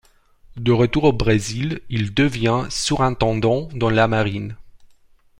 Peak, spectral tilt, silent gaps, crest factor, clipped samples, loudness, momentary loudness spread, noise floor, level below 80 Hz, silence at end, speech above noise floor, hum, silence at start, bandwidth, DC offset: -2 dBFS; -5.5 dB/octave; none; 18 dB; under 0.1%; -20 LUFS; 8 LU; -52 dBFS; -38 dBFS; 0.55 s; 33 dB; none; 0.55 s; 12 kHz; under 0.1%